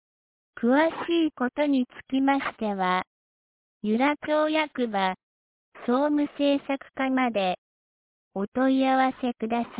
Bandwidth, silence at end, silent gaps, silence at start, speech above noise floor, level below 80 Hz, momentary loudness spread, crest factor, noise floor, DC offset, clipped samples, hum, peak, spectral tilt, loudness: 4 kHz; 0 s; 3.07-3.81 s, 5.23-5.72 s, 7.58-8.31 s, 8.48-8.52 s; 0.55 s; over 65 dB; -66 dBFS; 8 LU; 14 dB; under -90 dBFS; under 0.1%; under 0.1%; none; -12 dBFS; -9 dB/octave; -26 LUFS